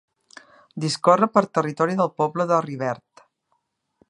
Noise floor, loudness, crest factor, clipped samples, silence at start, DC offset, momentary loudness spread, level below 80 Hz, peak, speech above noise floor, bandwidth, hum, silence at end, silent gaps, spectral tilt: -72 dBFS; -21 LUFS; 22 dB; under 0.1%; 0.75 s; under 0.1%; 11 LU; -72 dBFS; -2 dBFS; 51 dB; 11.5 kHz; none; 1.15 s; none; -5.5 dB/octave